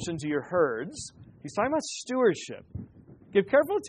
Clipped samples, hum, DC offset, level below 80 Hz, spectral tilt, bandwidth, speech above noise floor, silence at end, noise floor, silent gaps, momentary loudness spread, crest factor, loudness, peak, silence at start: under 0.1%; none; under 0.1%; -60 dBFS; -4.5 dB/octave; 10 kHz; 23 dB; 0 s; -50 dBFS; none; 19 LU; 18 dB; -28 LUFS; -10 dBFS; 0 s